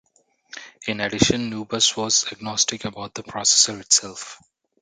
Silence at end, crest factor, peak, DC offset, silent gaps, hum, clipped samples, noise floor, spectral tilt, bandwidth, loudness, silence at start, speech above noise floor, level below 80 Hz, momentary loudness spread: 0.45 s; 22 dB; -2 dBFS; under 0.1%; none; none; under 0.1%; -61 dBFS; -1.5 dB/octave; 11 kHz; -20 LUFS; 0.55 s; 39 dB; -52 dBFS; 20 LU